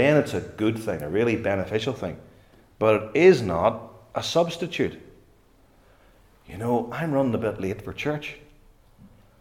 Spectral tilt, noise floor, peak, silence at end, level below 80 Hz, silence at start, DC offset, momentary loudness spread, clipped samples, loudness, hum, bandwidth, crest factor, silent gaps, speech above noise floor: -6 dB/octave; -57 dBFS; -6 dBFS; 0.35 s; -56 dBFS; 0 s; under 0.1%; 15 LU; under 0.1%; -24 LUFS; none; 15.5 kHz; 20 dB; none; 34 dB